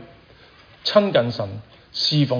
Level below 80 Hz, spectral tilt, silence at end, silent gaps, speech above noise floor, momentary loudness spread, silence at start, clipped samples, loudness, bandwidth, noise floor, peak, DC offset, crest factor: -58 dBFS; -6 dB/octave; 0 s; none; 29 dB; 14 LU; 0 s; under 0.1%; -21 LUFS; 5.4 kHz; -49 dBFS; -2 dBFS; under 0.1%; 20 dB